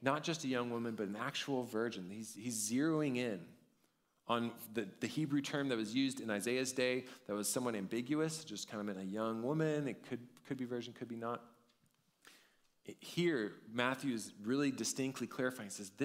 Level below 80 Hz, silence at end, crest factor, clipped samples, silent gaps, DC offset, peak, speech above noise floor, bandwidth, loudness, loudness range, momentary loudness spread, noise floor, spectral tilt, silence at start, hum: -84 dBFS; 0 s; 22 dB; under 0.1%; none; under 0.1%; -16 dBFS; 39 dB; 16 kHz; -39 LUFS; 5 LU; 10 LU; -78 dBFS; -4.5 dB/octave; 0 s; none